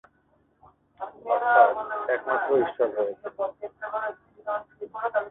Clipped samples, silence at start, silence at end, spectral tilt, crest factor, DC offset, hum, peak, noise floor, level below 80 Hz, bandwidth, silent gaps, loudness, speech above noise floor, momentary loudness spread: under 0.1%; 1 s; 0 s; -8.5 dB/octave; 22 dB; under 0.1%; none; -4 dBFS; -66 dBFS; -70 dBFS; 4 kHz; none; -26 LUFS; 41 dB; 19 LU